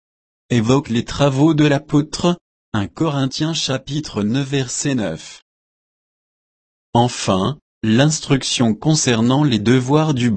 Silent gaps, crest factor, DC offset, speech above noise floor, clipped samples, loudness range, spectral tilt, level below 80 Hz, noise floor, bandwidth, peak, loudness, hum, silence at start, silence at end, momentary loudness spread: 2.41-2.72 s, 5.42-6.93 s, 7.62-7.81 s; 16 dB; under 0.1%; over 73 dB; under 0.1%; 6 LU; -5 dB/octave; -46 dBFS; under -90 dBFS; 8.8 kHz; -2 dBFS; -18 LUFS; none; 0.5 s; 0 s; 9 LU